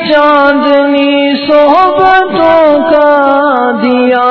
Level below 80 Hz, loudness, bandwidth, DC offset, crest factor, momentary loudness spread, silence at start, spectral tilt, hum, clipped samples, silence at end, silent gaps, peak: -44 dBFS; -7 LUFS; 6 kHz; under 0.1%; 6 dB; 3 LU; 0 s; -6.5 dB/octave; none; 2%; 0 s; none; 0 dBFS